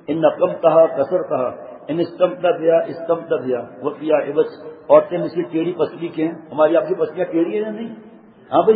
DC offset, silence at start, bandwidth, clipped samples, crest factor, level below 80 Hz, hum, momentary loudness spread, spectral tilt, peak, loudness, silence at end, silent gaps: under 0.1%; 0.1 s; 4.9 kHz; under 0.1%; 18 dB; -66 dBFS; none; 11 LU; -11.5 dB/octave; 0 dBFS; -19 LUFS; 0 s; none